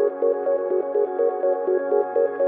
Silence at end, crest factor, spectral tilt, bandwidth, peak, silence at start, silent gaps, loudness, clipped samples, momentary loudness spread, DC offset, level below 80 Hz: 0 s; 12 dB; -10 dB/octave; 2.7 kHz; -10 dBFS; 0 s; none; -22 LUFS; under 0.1%; 1 LU; under 0.1%; -88 dBFS